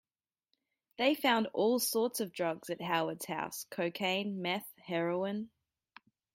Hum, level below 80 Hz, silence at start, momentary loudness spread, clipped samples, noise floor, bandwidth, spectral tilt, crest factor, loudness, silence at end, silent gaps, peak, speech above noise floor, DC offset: none; -82 dBFS; 1 s; 9 LU; under 0.1%; -84 dBFS; 16.5 kHz; -3.5 dB/octave; 18 dB; -34 LUFS; 0.9 s; none; -16 dBFS; 50 dB; under 0.1%